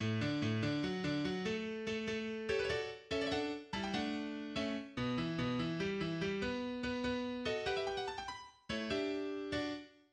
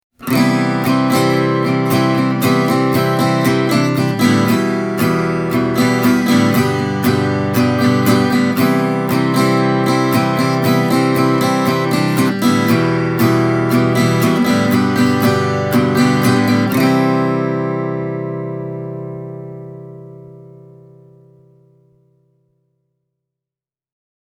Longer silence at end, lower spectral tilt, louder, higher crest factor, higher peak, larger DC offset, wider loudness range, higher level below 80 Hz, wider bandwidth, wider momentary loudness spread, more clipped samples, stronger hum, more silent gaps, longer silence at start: second, 0.2 s vs 3.9 s; about the same, -5.5 dB/octave vs -6 dB/octave; second, -39 LUFS vs -14 LUFS; about the same, 14 dB vs 14 dB; second, -24 dBFS vs 0 dBFS; neither; second, 1 LU vs 8 LU; second, -62 dBFS vs -54 dBFS; second, 10.5 kHz vs over 20 kHz; second, 5 LU vs 8 LU; neither; neither; neither; second, 0 s vs 0.2 s